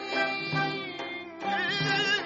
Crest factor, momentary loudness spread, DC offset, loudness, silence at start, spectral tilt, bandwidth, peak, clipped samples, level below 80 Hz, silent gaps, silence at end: 16 dB; 10 LU; under 0.1%; -29 LUFS; 0 s; -1.5 dB/octave; 8 kHz; -14 dBFS; under 0.1%; -68 dBFS; none; 0 s